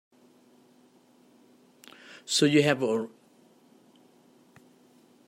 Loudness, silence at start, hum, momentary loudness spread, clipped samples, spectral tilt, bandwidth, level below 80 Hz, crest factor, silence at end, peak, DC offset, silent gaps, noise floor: -25 LUFS; 2.1 s; none; 26 LU; under 0.1%; -4 dB/octave; 16 kHz; -76 dBFS; 24 dB; 2.2 s; -8 dBFS; under 0.1%; none; -60 dBFS